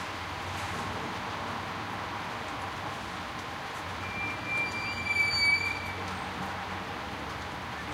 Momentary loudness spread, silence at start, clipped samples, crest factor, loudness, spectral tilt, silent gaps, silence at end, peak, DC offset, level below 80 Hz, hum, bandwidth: 12 LU; 0 s; under 0.1%; 18 dB; -32 LUFS; -3.5 dB/octave; none; 0 s; -16 dBFS; under 0.1%; -54 dBFS; none; 16 kHz